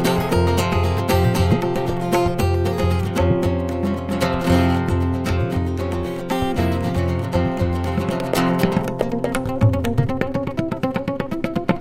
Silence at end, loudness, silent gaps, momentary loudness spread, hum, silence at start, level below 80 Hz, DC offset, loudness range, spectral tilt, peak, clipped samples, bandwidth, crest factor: 0 s; -20 LUFS; none; 5 LU; none; 0 s; -34 dBFS; under 0.1%; 2 LU; -7 dB/octave; -2 dBFS; under 0.1%; 16 kHz; 18 dB